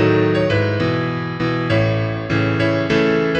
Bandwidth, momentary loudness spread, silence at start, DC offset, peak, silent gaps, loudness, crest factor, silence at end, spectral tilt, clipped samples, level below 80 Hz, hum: 7.8 kHz; 5 LU; 0 s; under 0.1%; -4 dBFS; none; -18 LUFS; 14 dB; 0 s; -7.5 dB/octave; under 0.1%; -42 dBFS; none